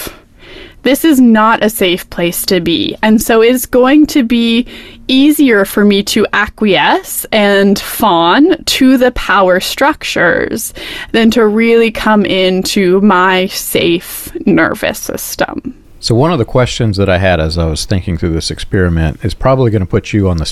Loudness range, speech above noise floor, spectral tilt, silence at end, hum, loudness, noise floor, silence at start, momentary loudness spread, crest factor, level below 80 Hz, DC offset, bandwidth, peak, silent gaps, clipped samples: 4 LU; 24 dB; -5 dB/octave; 0 s; none; -10 LUFS; -34 dBFS; 0 s; 9 LU; 10 dB; -32 dBFS; under 0.1%; 15.5 kHz; 0 dBFS; none; under 0.1%